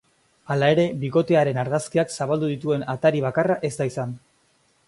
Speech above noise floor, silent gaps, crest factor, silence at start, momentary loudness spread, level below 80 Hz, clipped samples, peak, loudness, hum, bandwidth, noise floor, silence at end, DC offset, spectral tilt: 42 dB; none; 18 dB; 0.5 s; 8 LU; -62 dBFS; under 0.1%; -4 dBFS; -23 LUFS; none; 11.5 kHz; -63 dBFS; 0.7 s; under 0.1%; -6.5 dB/octave